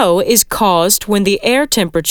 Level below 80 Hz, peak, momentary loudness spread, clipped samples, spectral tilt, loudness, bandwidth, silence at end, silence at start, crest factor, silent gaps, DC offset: -40 dBFS; 0 dBFS; 3 LU; under 0.1%; -3 dB/octave; -12 LUFS; over 20 kHz; 0 s; 0 s; 12 dB; none; under 0.1%